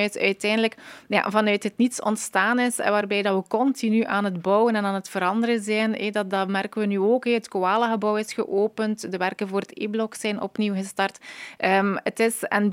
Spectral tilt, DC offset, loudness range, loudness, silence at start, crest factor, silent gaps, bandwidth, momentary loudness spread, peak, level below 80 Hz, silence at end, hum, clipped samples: -4.5 dB/octave; under 0.1%; 3 LU; -24 LUFS; 0 s; 20 dB; none; 16 kHz; 6 LU; -4 dBFS; -76 dBFS; 0 s; none; under 0.1%